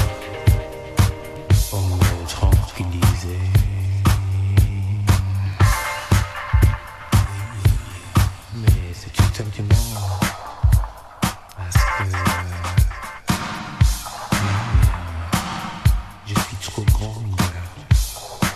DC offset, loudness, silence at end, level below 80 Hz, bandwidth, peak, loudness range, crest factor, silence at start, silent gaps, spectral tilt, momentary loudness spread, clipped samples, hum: under 0.1%; -21 LUFS; 0 s; -24 dBFS; 14 kHz; -2 dBFS; 2 LU; 18 dB; 0 s; none; -5 dB/octave; 7 LU; under 0.1%; none